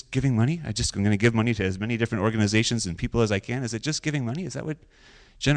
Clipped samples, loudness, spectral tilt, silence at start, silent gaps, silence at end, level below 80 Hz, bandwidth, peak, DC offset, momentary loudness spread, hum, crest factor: under 0.1%; -25 LUFS; -5 dB/octave; 0.1 s; none; 0 s; -44 dBFS; 10 kHz; -10 dBFS; under 0.1%; 8 LU; none; 16 dB